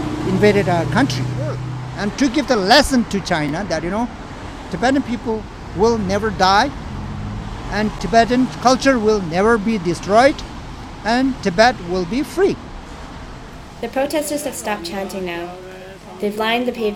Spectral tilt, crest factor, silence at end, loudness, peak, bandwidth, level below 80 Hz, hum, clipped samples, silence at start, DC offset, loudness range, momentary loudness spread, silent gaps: -5 dB/octave; 18 dB; 0 s; -18 LUFS; 0 dBFS; 18 kHz; -36 dBFS; none; under 0.1%; 0 s; under 0.1%; 7 LU; 18 LU; none